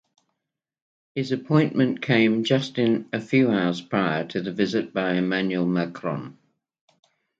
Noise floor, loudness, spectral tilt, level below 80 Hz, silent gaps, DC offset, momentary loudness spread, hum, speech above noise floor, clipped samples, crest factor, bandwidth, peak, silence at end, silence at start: -84 dBFS; -23 LUFS; -7 dB/octave; -66 dBFS; none; under 0.1%; 10 LU; none; 61 dB; under 0.1%; 18 dB; 7.8 kHz; -6 dBFS; 1.05 s; 1.15 s